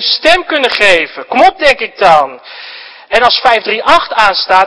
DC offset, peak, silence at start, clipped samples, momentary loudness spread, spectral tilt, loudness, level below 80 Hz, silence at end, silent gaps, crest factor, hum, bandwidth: under 0.1%; 0 dBFS; 0 s; 3%; 18 LU; -2 dB/octave; -9 LUFS; -40 dBFS; 0 s; none; 10 dB; none; 11 kHz